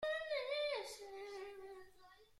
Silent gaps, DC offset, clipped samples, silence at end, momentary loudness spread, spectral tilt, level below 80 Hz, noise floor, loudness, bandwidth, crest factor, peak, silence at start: none; under 0.1%; under 0.1%; 0 s; 17 LU; -1 dB/octave; -76 dBFS; -65 dBFS; -44 LUFS; 14.5 kHz; 14 dB; -30 dBFS; 0 s